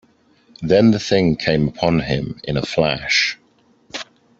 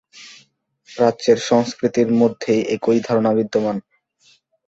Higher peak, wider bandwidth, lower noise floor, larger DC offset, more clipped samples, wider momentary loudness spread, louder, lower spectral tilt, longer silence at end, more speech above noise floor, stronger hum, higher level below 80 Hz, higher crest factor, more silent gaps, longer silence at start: about the same, -2 dBFS vs -2 dBFS; about the same, 7.8 kHz vs 8 kHz; about the same, -57 dBFS vs -57 dBFS; neither; neither; first, 17 LU vs 5 LU; about the same, -18 LUFS vs -18 LUFS; about the same, -5.5 dB/octave vs -5.5 dB/octave; second, 0.35 s vs 0.9 s; about the same, 39 dB vs 40 dB; neither; first, -44 dBFS vs -60 dBFS; about the same, 18 dB vs 18 dB; neither; first, 0.6 s vs 0.15 s